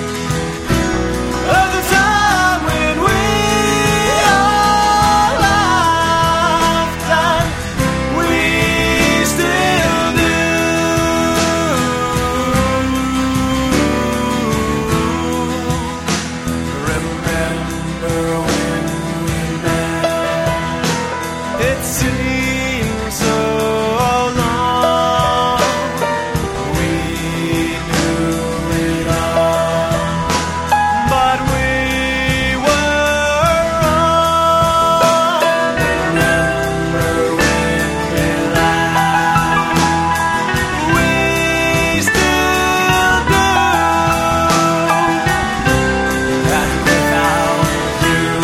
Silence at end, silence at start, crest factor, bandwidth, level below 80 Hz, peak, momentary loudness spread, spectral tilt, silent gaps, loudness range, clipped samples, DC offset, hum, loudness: 0 s; 0 s; 14 dB; 16.5 kHz; -30 dBFS; 0 dBFS; 6 LU; -4.5 dB/octave; none; 5 LU; under 0.1%; under 0.1%; none; -14 LUFS